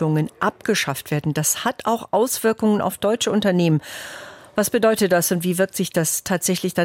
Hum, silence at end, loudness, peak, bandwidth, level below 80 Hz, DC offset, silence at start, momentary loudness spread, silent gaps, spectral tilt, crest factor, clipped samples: none; 0 s; -20 LUFS; -6 dBFS; 17 kHz; -58 dBFS; under 0.1%; 0 s; 6 LU; none; -4.5 dB/octave; 14 dB; under 0.1%